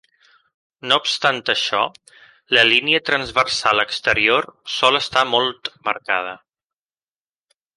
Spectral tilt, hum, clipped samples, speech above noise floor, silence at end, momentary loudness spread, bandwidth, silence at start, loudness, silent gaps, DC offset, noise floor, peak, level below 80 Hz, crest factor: -2 dB/octave; none; under 0.1%; over 71 dB; 1.4 s; 10 LU; 11.5 kHz; 0.85 s; -17 LUFS; none; under 0.1%; under -90 dBFS; 0 dBFS; -56 dBFS; 20 dB